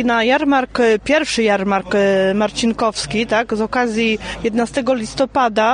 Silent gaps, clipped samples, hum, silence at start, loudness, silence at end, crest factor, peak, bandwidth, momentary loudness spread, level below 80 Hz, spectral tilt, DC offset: none; under 0.1%; none; 0 s; -17 LUFS; 0 s; 12 dB; -4 dBFS; 10 kHz; 5 LU; -42 dBFS; -4.5 dB/octave; under 0.1%